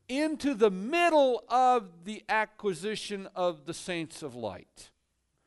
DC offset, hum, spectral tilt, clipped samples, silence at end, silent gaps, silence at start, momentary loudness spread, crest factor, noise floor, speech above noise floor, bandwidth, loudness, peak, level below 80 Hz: under 0.1%; none; -4.5 dB/octave; under 0.1%; 0.6 s; none; 0.1 s; 15 LU; 18 dB; -77 dBFS; 48 dB; 11.5 kHz; -29 LUFS; -12 dBFS; -68 dBFS